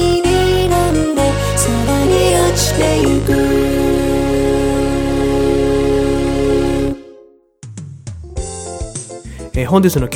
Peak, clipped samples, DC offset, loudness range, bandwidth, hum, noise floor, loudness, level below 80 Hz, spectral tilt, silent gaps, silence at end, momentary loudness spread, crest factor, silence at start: 0 dBFS; under 0.1%; under 0.1%; 7 LU; 19 kHz; none; -44 dBFS; -14 LUFS; -26 dBFS; -5.5 dB/octave; none; 0 s; 15 LU; 14 dB; 0 s